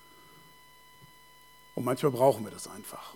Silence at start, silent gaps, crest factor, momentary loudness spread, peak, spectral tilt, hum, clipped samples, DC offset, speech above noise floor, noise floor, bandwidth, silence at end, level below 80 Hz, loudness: 1.75 s; none; 22 dB; 17 LU; -10 dBFS; -6 dB/octave; none; under 0.1%; under 0.1%; 27 dB; -57 dBFS; 19 kHz; 0 s; -72 dBFS; -30 LUFS